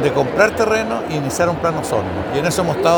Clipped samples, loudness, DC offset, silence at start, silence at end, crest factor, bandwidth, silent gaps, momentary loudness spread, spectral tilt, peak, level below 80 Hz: under 0.1%; -18 LUFS; under 0.1%; 0 s; 0 s; 18 dB; over 20 kHz; none; 6 LU; -5 dB/octave; 0 dBFS; -44 dBFS